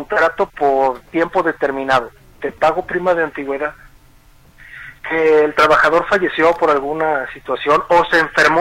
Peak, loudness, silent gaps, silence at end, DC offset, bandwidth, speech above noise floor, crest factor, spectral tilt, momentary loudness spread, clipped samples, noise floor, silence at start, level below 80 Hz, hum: -2 dBFS; -16 LUFS; none; 0 s; under 0.1%; 15.5 kHz; 32 dB; 14 dB; -4.5 dB/octave; 11 LU; under 0.1%; -47 dBFS; 0 s; -46 dBFS; none